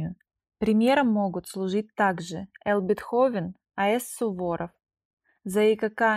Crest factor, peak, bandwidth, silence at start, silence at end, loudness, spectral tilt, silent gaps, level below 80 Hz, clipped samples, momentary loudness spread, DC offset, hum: 16 dB; -10 dBFS; 15.5 kHz; 0 s; 0 s; -26 LUFS; -5.5 dB/octave; 5.05-5.17 s; -62 dBFS; under 0.1%; 12 LU; under 0.1%; none